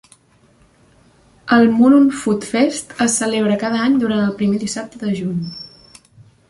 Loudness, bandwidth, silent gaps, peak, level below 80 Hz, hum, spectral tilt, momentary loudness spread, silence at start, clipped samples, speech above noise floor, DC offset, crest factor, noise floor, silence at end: -16 LUFS; 11.5 kHz; none; -2 dBFS; -56 dBFS; none; -5 dB/octave; 14 LU; 1.45 s; under 0.1%; 38 dB; under 0.1%; 16 dB; -53 dBFS; 0.85 s